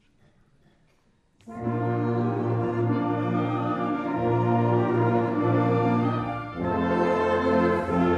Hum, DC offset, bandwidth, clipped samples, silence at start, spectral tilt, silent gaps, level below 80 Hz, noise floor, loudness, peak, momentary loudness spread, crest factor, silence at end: none; under 0.1%; 7 kHz; under 0.1%; 1.45 s; -9 dB/octave; none; -54 dBFS; -64 dBFS; -25 LUFS; -12 dBFS; 6 LU; 14 dB; 0 s